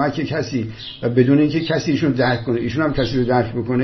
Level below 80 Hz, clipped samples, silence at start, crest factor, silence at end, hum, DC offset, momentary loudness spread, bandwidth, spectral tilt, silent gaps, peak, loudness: -42 dBFS; under 0.1%; 0 s; 16 dB; 0 s; none; under 0.1%; 9 LU; 6.2 kHz; -7 dB/octave; none; -2 dBFS; -19 LUFS